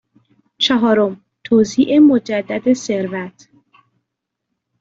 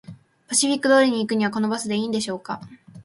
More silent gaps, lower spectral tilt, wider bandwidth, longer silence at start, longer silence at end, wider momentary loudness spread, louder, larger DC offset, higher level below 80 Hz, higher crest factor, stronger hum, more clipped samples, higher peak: neither; first, -5 dB/octave vs -3.5 dB/octave; second, 7.8 kHz vs 11.5 kHz; first, 0.6 s vs 0.1 s; first, 1.5 s vs 0 s; about the same, 13 LU vs 13 LU; first, -15 LUFS vs -21 LUFS; neither; first, -58 dBFS vs -66 dBFS; second, 14 dB vs 20 dB; neither; neither; about the same, -2 dBFS vs -4 dBFS